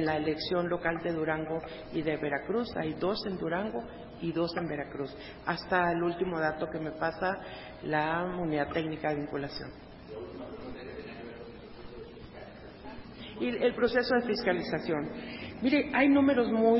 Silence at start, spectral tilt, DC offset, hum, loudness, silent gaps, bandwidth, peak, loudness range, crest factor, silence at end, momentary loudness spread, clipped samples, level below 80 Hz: 0 s; -9.5 dB/octave; under 0.1%; none; -31 LUFS; none; 5.8 kHz; -12 dBFS; 11 LU; 20 dB; 0 s; 19 LU; under 0.1%; -56 dBFS